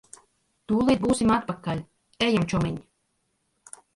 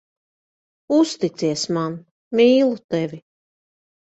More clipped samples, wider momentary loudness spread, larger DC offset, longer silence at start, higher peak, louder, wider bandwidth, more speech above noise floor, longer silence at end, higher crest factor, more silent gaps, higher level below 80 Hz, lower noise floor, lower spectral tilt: neither; first, 15 LU vs 12 LU; neither; second, 0.7 s vs 0.9 s; second, -10 dBFS vs -4 dBFS; second, -25 LUFS vs -20 LUFS; first, 11.5 kHz vs 8.2 kHz; second, 50 dB vs over 71 dB; first, 1.15 s vs 0.85 s; about the same, 18 dB vs 18 dB; second, none vs 2.11-2.31 s, 2.84-2.89 s; first, -50 dBFS vs -66 dBFS; second, -74 dBFS vs under -90 dBFS; about the same, -5.5 dB/octave vs -5.5 dB/octave